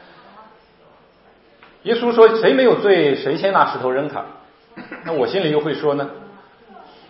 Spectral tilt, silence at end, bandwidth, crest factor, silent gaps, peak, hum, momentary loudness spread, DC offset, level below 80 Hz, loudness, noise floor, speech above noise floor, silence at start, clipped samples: -9 dB/octave; 0.8 s; 5.8 kHz; 18 dB; none; 0 dBFS; none; 18 LU; under 0.1%; -66 dBFS; -17 LUFS; -52 dBFS; 35 dB; 1.85 s; under 0.1%